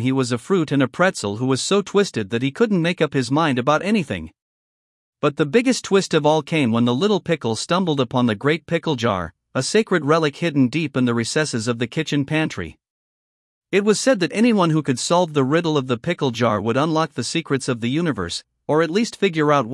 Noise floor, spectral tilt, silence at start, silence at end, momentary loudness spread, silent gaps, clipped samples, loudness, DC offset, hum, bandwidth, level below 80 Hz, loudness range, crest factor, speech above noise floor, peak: under -90 dBFS; -5 dB/octave; 0 s; 0 s; 6 LU; 4.42-5.13 s, 12.90-13.61 s; under 0.1%; -20 LUFS; under 0.1%; none; 12 kHz; -60 dBFS; 2 LU; 16 dB; over 71 dB; -2 dBFS